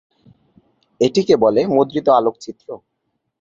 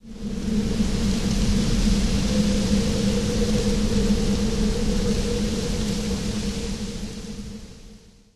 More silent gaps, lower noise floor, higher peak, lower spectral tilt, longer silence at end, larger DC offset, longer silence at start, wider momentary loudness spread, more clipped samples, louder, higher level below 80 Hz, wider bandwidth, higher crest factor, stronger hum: neither; first, -56 dBFS vs -47 dBFS; first, -2 dBFS vs -8 dBFS; about the same, -6 dB/octave vs -5.5 dB/octave; first, 0.65 s vs 0 s; second, under 0.1% vs 2%; first, 1 s vs 0 s; first, 20 LU vs 11 LU; neither; first, -16 LUFS vs -24 LUFS; second, -58 dBFS vs -28 dBFS; second, 7.8 kHz vs 13.5 kHz; about the same, 18 dB vs 14 dB; neither